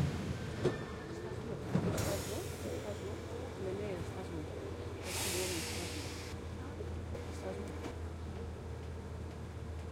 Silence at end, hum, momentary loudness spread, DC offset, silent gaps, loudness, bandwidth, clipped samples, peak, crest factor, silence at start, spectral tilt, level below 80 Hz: 0 s; none; 9 LU; under 0.1%; none; -41 LUFS; 16.5 kHz; under 0.1%; -20 dBFS; 20 dB; 0 s; -5 dB/octave; -54 dBFS